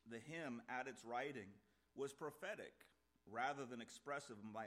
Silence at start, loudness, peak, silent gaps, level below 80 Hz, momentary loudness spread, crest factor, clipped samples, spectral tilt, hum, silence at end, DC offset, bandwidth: 0.05 s; -50 LUFS; -30 dBFS; none; -88 dBFS; 9 LU; 20 dB; under 0.1%; -4.5 dB/octave; none; 0 s; under 0.1%; 15.5 kHz